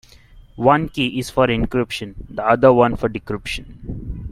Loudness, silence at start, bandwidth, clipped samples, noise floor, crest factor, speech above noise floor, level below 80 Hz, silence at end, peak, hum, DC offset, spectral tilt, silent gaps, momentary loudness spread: -18 LUFS; 0.35 s; 15 kHz; under 0.1%; -45 dBFS; 18 dB; 27 dB; -36 dBFS; 0 s; 0 dBFS; none; under 0.1%; -6 dB/octave; none; 17 LU